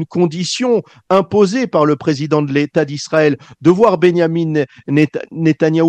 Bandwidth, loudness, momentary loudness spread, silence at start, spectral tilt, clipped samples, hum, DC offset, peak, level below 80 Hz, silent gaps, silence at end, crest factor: 9.2 kHz; -15 LUFS; 6 LU; 0 s; -6.5 dB/octave; under 0.1%; none; under 0.1%; 0 dBFS; -58 dBFS; none; 0 s; 14 dB